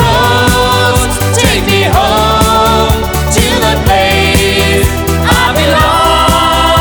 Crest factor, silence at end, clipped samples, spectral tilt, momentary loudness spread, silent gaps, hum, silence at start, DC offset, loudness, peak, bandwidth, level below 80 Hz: 8 dB; 0 s; 0.2%; -4 dB/octave; 3 LU; none; none; 0 s; under 0.1%; -8 LUFS; 0 dBFS; over 20 kHz; -18 dBFS